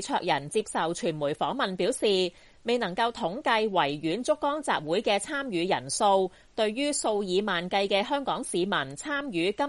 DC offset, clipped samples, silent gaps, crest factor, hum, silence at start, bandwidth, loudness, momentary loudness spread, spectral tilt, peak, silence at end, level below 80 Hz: under 0.1%; under 0.1%; none; 16 dB; none; 0 s; 11.5 kHz; -28 LUFS; 5 LU; -3.5 dB/octave; -10 dBFS; 0 s; -62 dBFS